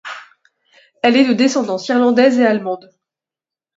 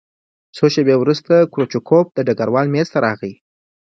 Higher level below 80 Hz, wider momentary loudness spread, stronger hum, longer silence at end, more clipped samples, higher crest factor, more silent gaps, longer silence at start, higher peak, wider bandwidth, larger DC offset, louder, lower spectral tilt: second, -68 dBFS vs -60 dBFS; first, 16 LU vs 6 LU; neither; first, 1 s vs 0.55 s; neither; about the same, 16 dB vs 16 dB; neither; second, 0.05 s vs 0.55 s; about the same, 0 dBFS vs 0 dBFS; about the same, 7.8 kHz vs 7.8 kHz; neither; about the same, -14 LUFS vs -16 LUFS; second, -4.5 dB/octave vs -7 dB/octave